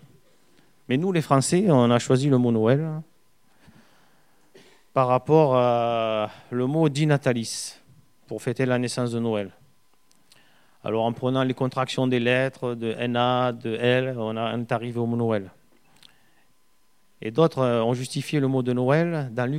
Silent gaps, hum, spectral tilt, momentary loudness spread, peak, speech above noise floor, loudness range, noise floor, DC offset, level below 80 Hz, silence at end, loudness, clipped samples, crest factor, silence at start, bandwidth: none; none; -6 dB/octave; 10 LU; -4 dBFS; 44 dB; 6 LU; -67 dBFS; 0.1%; -68 dBFS; 0 s; -23 LUFS; under 0.1%; 20 dB; 0.9 s; 14.5 kHz